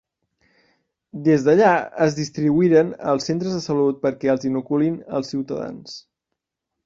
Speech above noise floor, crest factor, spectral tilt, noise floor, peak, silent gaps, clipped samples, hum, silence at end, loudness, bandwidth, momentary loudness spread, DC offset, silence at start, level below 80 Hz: 62 dB; 18 dB; -6.5 dB/octave; -82 dBFS; -4 dBFS; none; under 0.1%; none; 0.85 s; -20 LUFS; 7.6 kHz; 14 LU; under 0.1%; 1.15 s; -62 dBFS